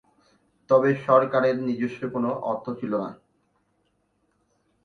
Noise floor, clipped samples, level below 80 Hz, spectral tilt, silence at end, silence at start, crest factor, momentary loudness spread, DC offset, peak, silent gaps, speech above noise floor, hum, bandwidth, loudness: -70 dBFS; under 0.1%; -68 dBFS; -8.5 dB/octave; 1.7 s; 0.7 s; 22 dB; 10 LU; under 0.1%; -4 dBFS; none; 47 dB; none; 6.4 kHz; -24 LUFS